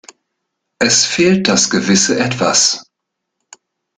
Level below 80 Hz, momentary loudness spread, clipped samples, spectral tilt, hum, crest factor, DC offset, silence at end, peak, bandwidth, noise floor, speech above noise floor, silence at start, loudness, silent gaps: -52 dBFS; 4 LU; under 0.1%; -2.5 dB/octave; none; 16 dB; under 0.1%; 1.15 s; 0 dBFS; 10 kHz; -76 dBFS; 63 dB; 0.8 s; -12 LUFS; none